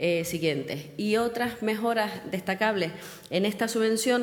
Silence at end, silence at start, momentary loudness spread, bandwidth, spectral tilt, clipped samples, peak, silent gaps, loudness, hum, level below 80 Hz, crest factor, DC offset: 0 s; 0 s; 7 LU; 19.5 kHz; -4.5 dB/octave; under 0.1%; -10 dBFS; none; -28 LUFS; none; -64 dBFS; 16 dB; under 0.1%